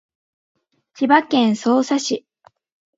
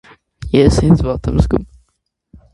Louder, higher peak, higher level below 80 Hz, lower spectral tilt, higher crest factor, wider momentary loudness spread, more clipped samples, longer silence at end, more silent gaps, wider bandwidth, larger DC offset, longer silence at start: second, -18 LUFS vs -14 LUFS; about the same, 0 dBFS vs 0 dBFS; second, -72 dBFS vs -24 dBFS; second, -4 dB/octave vs -7.5 dB/octave; about the same, 20 dB vs 16 dB; about the same, 10 LU vs 8 LU; neither; about the same, 0.8 s vs 0.9 s; neither; second, 7.8 kHz vs 11.5 kHz; neither; first, 1 s vs 0.4 s